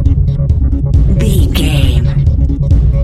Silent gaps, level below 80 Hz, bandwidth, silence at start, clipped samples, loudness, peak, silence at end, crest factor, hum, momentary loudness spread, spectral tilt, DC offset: none; -12 dBFS; 13.5 kHz; 0 s; 0.1%; -12 LUFS; 0 dBFS; 0 s; 10 dB; none; 2 LU; -7 dB/octave; under 0.1%